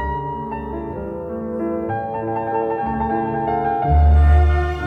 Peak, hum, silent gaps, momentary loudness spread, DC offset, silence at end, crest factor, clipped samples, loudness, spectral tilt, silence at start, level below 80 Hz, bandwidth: -6 dBFS; none; none; 14 LU; under 0.1%; 0 s; 14 dB; under 0.1%; -20 LUFS; -9.5 dB/octave; 0 s; -20 dBFS; 3.8 kHz